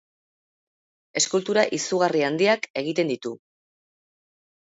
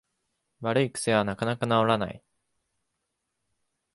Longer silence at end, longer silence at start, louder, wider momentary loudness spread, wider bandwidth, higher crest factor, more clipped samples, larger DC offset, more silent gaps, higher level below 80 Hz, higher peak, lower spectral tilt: second, 1.3 s vs 1.8 s; first, 1.15 s vs 0.6 s; first, -23 LUFS vs -26 LUFS; first, 10 LU vs 7 LU; second, 8 kHz vs 11.5 kHz; about the same, 22 dB vs 22 dB; neither; neither; first, 2.70-2.74 s vs none; second, -76 dBFS vs -62 dBFS; first, -4 dBFS vs -8 dBFS; second, -3 dB/octave vs -5 dB/octave